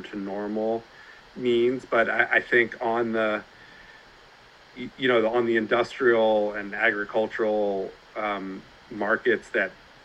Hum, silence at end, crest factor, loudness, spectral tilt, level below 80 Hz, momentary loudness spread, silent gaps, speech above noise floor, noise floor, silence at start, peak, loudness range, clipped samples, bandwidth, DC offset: none; 0.3 s; 20 dB; -25 LUFS; -6 dB/octave; -62 dBFS; 12 LU; none; 27 dB; -52 dBFS; 0 s; -6 dBFS; 3 LU; under 0.1%; 8.2 kHz; under 0.1%